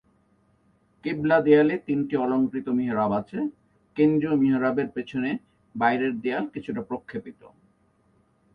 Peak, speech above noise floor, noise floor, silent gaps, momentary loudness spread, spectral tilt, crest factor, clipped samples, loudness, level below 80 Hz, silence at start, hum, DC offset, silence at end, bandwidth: -6 dBFS; 41 dB; -64 dBFS; none; 15 LU; -9 dB/octave; 20 dB; under 0.1%; -25 LUFS; -64 dBFS; 1.05 s; none; under 0.1%; 1.05 s; 5 kHz